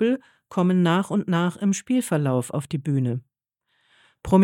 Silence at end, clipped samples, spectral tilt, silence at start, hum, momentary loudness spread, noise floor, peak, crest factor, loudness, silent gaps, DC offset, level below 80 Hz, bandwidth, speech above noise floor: 0 s; under 0.1%; -6.5 dB/octave; 0 s; none; 9 LU; -75 dBFS; -6 dBFS; 18 dB; -24 LUFS; none; under 0.1%; -54 dBFS; 14.5 kHz; 52 dB